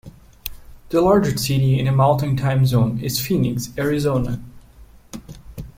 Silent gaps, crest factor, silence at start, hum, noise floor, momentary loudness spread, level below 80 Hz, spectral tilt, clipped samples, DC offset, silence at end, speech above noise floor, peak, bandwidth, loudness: none; 16 dB; 0.05 s; none; -46 dBFS; 21 LU; -40 dBFS; -6.5 dB/octave; under 0.1%; under 0.1%; 0.1 s; 28 dB; -4 dBFS; 16.5 kHz; -19 LUFS